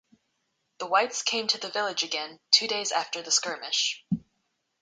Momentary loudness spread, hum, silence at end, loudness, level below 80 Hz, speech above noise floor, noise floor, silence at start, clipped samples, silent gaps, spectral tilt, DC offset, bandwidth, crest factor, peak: 11 LU; none; 0.6 s; -26 LUFS; -70 dBFS; 49 dB; -77 dBFS; 0.8 s; under 0.1%; none; -1 dB/octave; under 0.1%; 10.5 kHz; 26 dB; -4 dBFS